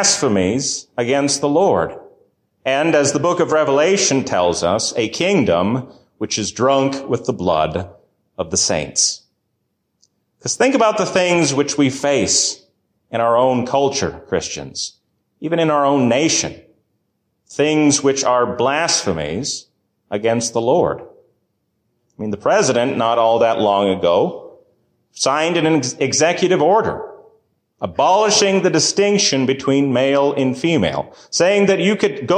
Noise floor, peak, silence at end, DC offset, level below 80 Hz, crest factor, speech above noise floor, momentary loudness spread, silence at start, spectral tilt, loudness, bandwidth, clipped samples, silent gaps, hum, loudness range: -71 dBFS; -2 dBFS; 0 s; under 0.1%; -48 dBFS; 16 dB; 54 dB; 11 LU; 0 s; -3.5 dB/octave; -16 LUFS; 10.5 kHz; under 0.1%; none; none; 4 LU